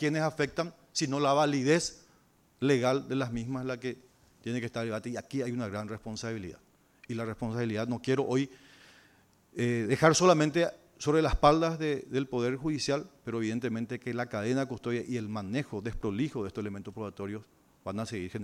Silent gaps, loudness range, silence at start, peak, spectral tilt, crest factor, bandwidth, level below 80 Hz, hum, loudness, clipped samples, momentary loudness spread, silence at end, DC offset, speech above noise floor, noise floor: none; 9 LU; 0 s; -8 dBFS; -5.5 dB/octave; 24 dB; 15 kHz; -50 dBFS; none; -31 LUFS; under 0.1%; 14 LU; 0 s; under 0.1%; 35 dB; -65 dBFS